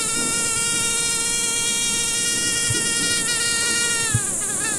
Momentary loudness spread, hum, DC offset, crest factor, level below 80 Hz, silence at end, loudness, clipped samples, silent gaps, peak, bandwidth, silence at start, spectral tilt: 1 LU; none; under 0.1%; 16 dB; -46 dBFS; 0 s; -19 LUFS; under 0.1%; none; -6 dBFS; 16 kHz; 0 s; -0.5 dB/octave